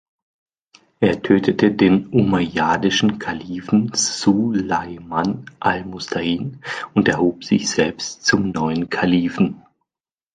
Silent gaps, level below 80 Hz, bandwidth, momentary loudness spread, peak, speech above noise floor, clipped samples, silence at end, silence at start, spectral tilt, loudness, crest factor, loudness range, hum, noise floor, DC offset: none; -50 dBFS; 9.6 kHz; 9 LU; -2 dBFS; over 71 dB; under 0.1%; 0.75 s; 1 s; -4.5 dB/octave; -19 LUFS; 18 dB; 3 LU; none; under -90 dBFS; under 0.1%